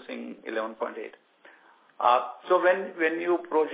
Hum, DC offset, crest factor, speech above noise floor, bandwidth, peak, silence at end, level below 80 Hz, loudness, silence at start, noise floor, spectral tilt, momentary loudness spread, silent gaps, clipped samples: none; under 0.1%; 20 dB; 31 dB; 4 kHz; -8 dBFS; 0 s; -82 dBFS; -27 LUFS; 0 s; -57 dBFS; -8 dB/octave; 15 LU; none; under 0.1%